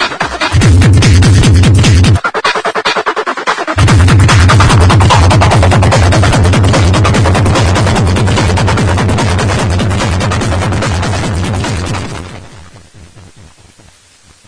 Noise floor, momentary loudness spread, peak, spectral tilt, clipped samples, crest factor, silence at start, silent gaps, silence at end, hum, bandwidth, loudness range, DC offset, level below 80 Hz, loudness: -43 dBFS; 8 LU; 0 dBFS; -5.5 dB/octave; under 0.1%; 8 dB; 0 s; none; 1.3 s; none; 10.5 kHz; 9 LU; under 0.1%; -20 dBFS; -9 LUFS